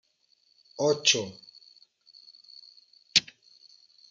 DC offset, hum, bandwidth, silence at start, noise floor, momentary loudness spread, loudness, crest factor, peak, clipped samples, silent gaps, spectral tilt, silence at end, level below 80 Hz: under 0.1%; none; 11 kHz; 0.8 s; -68 dBFS; 26 LU; -25 LUFS; 30 dB; -4 dBFS; under 0.1%; none; -1.5 dB/octave; 0.9 s; -78 dBFS